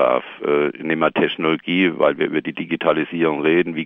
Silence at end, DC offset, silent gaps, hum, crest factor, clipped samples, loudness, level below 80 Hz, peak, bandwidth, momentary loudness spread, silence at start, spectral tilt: 0 s; under 0.1%; none; none; 16 dB; under 0.1%; -19 LUFS; -60 dBFS; -2 dBFS; 3.9 kHz; 5 LU; 0 s; -8 dB/octave